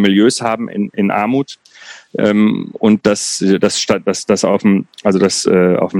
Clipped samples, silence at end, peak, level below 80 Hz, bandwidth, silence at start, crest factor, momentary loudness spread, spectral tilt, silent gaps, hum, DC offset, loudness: under 0.1%; 0 s; 0 dBFS; -56 dBFS; 12 kHz; 0 s; 14 dB; 7 LU; -5 dB/octave; none; none; under 0.1%; -14 LUFS